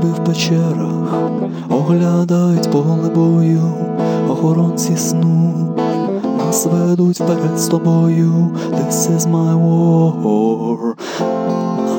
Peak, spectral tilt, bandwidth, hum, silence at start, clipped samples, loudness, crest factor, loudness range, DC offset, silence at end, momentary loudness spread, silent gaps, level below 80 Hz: -2 dBFS; -6.5 dB/octave; 17 kHz; none; 0 s; under 0.1%; -15 LUFS; 12 dB; 1 LU; under 0.1%; 0 s; 5 LU; none; -66 dBFS